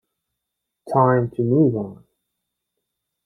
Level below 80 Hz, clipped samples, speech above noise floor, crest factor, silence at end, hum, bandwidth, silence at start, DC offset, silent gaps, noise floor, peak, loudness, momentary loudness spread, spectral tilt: -60 dBFS; under 0.1%; 63 dB; 20 dB; 1.3 s; none; 10 kHz; 0.85 s; under 0.1%; none; -81 dBFS; -2 dBFS; -19 LUFS; 11 LU; -11 dB/octave